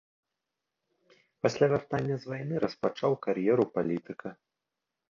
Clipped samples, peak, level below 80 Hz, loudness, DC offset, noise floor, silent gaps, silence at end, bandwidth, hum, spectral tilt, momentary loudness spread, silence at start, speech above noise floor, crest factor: under 0.1%; -10 dBFS; -66 dBFS; -30 LUFS; under 0.1%; -87 dBFS; none; 0.8 s; 7.4 kHz; none; -7 dB/octave; 9 LU; 1.45 s; 58 dB; 20 dB